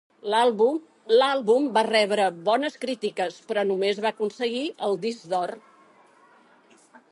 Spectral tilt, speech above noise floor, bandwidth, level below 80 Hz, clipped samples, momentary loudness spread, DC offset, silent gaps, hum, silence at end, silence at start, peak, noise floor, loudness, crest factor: -4 dB/octave; 33 dB; 11.5 kHz; -80 dBFS; under 0.1%; 8 LU; under 0.1%; none; none; 1.55 s; 0.25 s; -8 dBFS; -57 dBFS; -24 LUFS; 18 dB